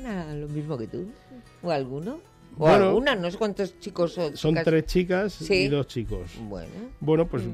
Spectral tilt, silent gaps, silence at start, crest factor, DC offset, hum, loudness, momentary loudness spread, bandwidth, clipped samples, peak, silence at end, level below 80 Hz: -6.5 dB/octave; none; 0 s; 16 dB; under 0.1%; none; -25 LUFS; 17 LU; 14.5 kHz; under 0.1%; -10 dBFS; 0 s; -44 dBFS